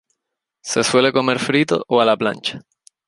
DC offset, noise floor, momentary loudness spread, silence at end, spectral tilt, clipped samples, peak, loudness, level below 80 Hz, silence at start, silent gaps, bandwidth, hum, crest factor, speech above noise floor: under 0.1%; -79 dBFS; 11 LU; 0.5 s; -4 dB/octave; under 0.1%; -2 dBFS; -17 LUFS; -62 dBFS; 0.65 s; none; 11.5 kHz; none; 18 dB; 62 dB